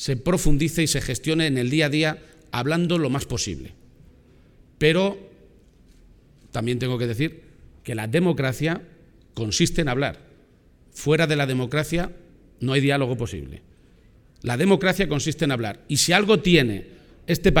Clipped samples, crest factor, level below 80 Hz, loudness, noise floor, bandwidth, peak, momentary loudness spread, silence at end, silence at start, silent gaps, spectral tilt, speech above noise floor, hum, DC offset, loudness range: under 0.1%; 22 dB; -38 dBFS; -22 LUFS; -55 dBFS; 18.5 kHz; -2 dBFS; 13 LU; 0 s; 0 s; none; -5 dB/octave; 33 dB; none; under 0.1%; 6 LU